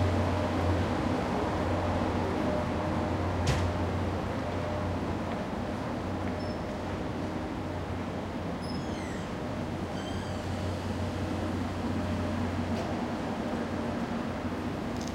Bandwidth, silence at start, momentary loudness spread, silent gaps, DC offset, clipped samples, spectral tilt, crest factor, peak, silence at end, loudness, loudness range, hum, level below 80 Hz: 13.5 kHz; 0 s; 6 LU; none; under 0.1%; under 0.1%; -6.5 dB/octave; 16 dB; -14 dBFS; 0 s; -32 LUFS; 5 LU; none; -46 dBFS